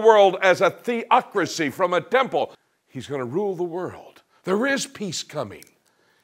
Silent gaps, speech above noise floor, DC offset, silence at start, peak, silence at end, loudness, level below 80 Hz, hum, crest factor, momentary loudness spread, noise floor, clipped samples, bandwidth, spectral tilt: none; 41 dB; under 0.1%; 0 s; -2 dBFS; 0.65 s; -22 LUFS; -72 dBFS; none; 22 dB; 14 LU; -63 dBFS; under 0.1%; 16 kHz; -4 dB/octave